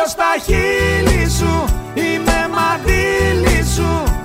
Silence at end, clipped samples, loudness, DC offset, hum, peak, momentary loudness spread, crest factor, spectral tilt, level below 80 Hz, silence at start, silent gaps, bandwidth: 0 s; under 0.1%; -15 LUFS; under 0.1%; none; -2 dBFS; 3 LU; 12 dB; -5 dB/octave; -20 dBFS; 0 s; none; 16.5 kHz